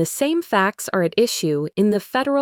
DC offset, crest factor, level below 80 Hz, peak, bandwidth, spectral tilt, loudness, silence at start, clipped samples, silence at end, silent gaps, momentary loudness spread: under 0.1%; 14 dB; -64 dBFS; -6 dBFS; 19 kHz; -4.5 dB/octave; -20 LUFS; 0 s; under 0.1%; 0 s; none; 3 LU